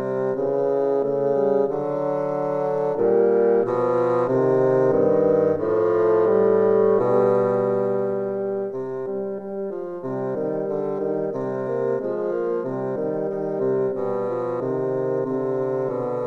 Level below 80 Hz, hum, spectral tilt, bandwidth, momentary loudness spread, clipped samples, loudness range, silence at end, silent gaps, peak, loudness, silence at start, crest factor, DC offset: -62 dBFS; none; -10 dB/octave; 6 kHz; 9 LU; under 0.1%; 7 LU; 0 s; none; -8 dBFS; -22 LUFS; 0 s; 14 dB; under 0.1%